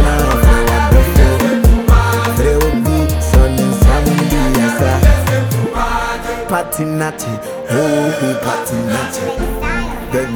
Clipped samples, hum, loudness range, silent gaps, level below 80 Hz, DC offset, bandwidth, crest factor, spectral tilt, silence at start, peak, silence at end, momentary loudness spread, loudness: under 0.1%; none; 5 LU; none; -16 dBFS; under 0.1%; over 20 kHz; 12 dB; -6 dB/octave; 0 s; 0 dBFS; 0 s; 8 LU; -14 LUFS